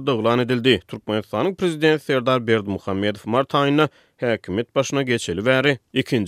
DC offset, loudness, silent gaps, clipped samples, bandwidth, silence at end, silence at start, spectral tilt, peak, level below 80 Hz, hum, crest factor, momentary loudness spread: under 0.1%; -21 LUFS; none; under 0.1%; 15 kHz; 0 s; 0 s; -5.5 dB/octave; -2 dBFS; -58 dBFS; none; 18 dB; 6 LU